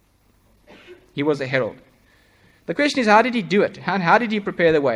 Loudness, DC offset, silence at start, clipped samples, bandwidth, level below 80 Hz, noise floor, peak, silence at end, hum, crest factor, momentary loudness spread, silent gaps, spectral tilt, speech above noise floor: -19 LUFS; under 0.1%; 0.9 s; under 0.1%; 11 kHz; -60 dBFS; -59 dBFS; -2 dBFS; 0 s; none; 20 dB; 13 LU; none; -5.5 dB/octave; 40 dB